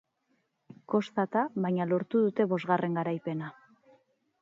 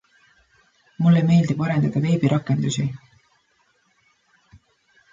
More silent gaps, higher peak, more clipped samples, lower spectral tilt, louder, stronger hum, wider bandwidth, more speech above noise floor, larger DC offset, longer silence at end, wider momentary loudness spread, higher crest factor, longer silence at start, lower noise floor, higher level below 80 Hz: neither; second, -12 dBFS vs -8 dBFS; neither; first, -8.5 dB/octave vs -7 dB/octave; second, -30 LUFS vs -20 LUFS; neither; about the same, 7.4 kHz vs 7.6 kHz; about the same, 46 dB vs 45 dB; neither; second, 0.9 s vs 2.15 s; about the same, 8 LU vs 9 LU; about the same, 20 dB vs 16 dB; about the same, 0.9 s vs 1 s; first, -75 dBFS vs -64 dBFS; second, -80 dBFS vs -60 dBFS